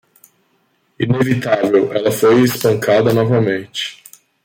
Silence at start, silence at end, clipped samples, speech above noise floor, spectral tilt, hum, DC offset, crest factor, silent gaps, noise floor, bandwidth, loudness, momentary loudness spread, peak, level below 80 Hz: 1 s; 0.5 s; under 0.1%; 47 dB; -6 dB/octave; none; under 0.1%; 14 dB; none; -61 dBFS; 17 kHz; -15 LUFS; 11 LU; -2 dBFS; -54 dBFS